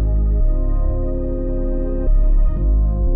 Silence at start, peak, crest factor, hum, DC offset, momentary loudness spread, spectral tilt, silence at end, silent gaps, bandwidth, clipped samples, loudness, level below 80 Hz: 0 s; -8 dBFS; 8 dB; none; under 0.1%; 5 LU; -14.5 dB/octave; 0 s; none; 2 kHz; under 0.1%; -21 LUFS; -16 dBFS